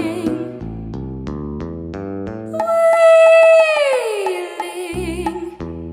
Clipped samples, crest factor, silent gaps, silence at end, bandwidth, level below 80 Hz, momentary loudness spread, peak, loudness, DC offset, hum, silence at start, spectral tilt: under 0.1%; 14 dB; none; 0 s; 14.5 kHz; -40 dBFS; 19 LU; -2 dBFS; -14 LUFS; under 0.1%; none; 0 s; -5 dB/octave